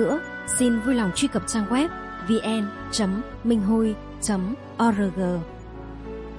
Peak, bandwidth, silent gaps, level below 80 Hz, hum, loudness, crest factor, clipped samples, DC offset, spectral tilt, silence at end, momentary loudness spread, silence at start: -8 dBFS; 11.5 kHz; none; -44 dBFS; none; -24 LUFS; 16 dB; under 0.1%; under 0.1%; -4.5 dB/octave; 0 s; 12 LU; 0 s